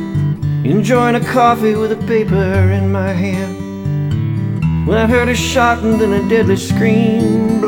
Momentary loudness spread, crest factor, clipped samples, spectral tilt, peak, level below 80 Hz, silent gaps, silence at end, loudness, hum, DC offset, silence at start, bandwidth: 6 LU; 14 dB; under 0.1%; -6.5 dB/octave; 0 dBFS; -34 dBFS; none; 0 s; -14 LUFS; none; under 0.1%; 0 s; 18 kHz